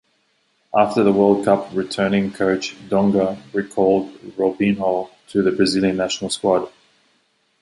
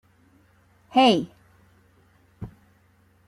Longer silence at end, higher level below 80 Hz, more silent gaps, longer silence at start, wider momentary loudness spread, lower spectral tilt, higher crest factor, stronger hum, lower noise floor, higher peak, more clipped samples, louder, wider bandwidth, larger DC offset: first, 0.95 s vs 0.8 s; first, -54 dBFS vs -60 dBFS; neither; second, 0.75 s vs 0.95 s; second, 8 LU vs 24 LU; about the same, -5.5 dB/octave vs -5 dB/octave; about the same, 18 dB vs 20 dB; neither; first, -64 dBFS vs -60 dBFS; first, -2 dBFS vs -8 dBFS; neither; about the same, -19 LUFS vs -20 LUFS; second, 11.5 kHz vs 13 kHz; neither